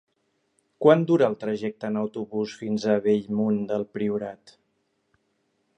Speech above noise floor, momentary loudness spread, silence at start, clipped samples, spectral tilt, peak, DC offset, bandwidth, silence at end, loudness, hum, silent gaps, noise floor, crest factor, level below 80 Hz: 49 dB; 11 LU; 0.8 s; under 0.1%; -7.5 dB/octave; -4 dBFS; under 0.1%; 8.6 kHz; 1.3 s; -25 LUFS; none; none; -73 dBFS; 22 dB; -70 dBFS